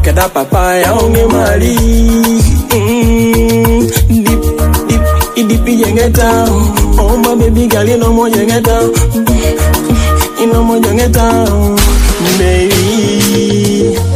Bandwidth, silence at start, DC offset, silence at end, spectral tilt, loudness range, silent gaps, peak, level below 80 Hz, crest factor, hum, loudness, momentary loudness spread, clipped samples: 16 kHz; 0 s; under 0.1%; 0 s; -5.5 dB/octave; 1 LU; none; 0 dBFS; -14 dBFS; 8 dB; none; -9 LUFS; 2 LU; 0.5%